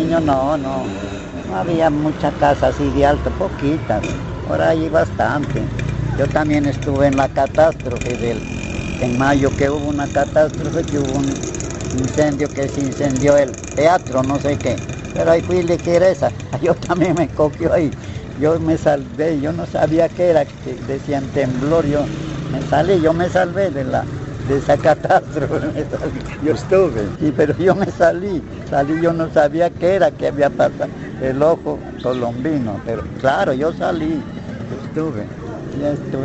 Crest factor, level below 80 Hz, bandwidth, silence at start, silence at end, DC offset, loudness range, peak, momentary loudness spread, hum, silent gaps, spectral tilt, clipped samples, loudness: 16 dB; -36 dBFS; 8.2 kHz; 0 s; 0 s; under 0.1%; 2 LU; 0 dBFS; 9 LU; none; none; -6.5 dB/octave; under 0.1%; -18 LUFS